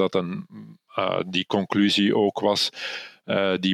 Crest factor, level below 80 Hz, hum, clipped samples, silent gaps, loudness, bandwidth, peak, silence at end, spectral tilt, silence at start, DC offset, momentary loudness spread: 18 dB; -70 dBFS; none; under 0.1%; none; -23 LUFS; 14.5 kHz; -6 dBFS; 0 s; -5 dB/octave; 0 s; under 0.1%; 14 LU